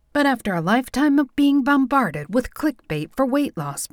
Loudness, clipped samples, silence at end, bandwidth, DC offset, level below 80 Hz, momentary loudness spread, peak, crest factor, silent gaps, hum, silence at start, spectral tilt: -21 LUFS; under 0.1%; 0.05 s; 17 kHz; under 0.1%; -48 dBFS; 8 LU; -6 dBFS; 14 dB; none; none; 0.15 s; -5.5 dB/octave